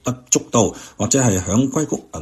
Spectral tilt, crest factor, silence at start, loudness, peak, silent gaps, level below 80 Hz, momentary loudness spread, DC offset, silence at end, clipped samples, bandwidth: -4.5 dB/octave; 18 dB; 0.05 s; -18 LUFS; 0 dBFS; none; -48 dBFS; 7 LU; under 0.1%; 0 s; under 0.1%; 14 kHz